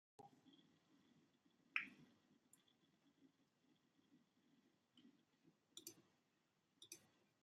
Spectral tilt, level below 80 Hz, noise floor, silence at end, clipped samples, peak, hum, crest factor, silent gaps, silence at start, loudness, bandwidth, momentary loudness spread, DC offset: -1 dB/octave; under -90 dBFS; -85 dBFS; 0.35 s; under 0.1%; -26 dBFS; none; 38 dB; none; 0.2 s; -53 LUFS; 12.5 kHz; 20 LU; under 0.1%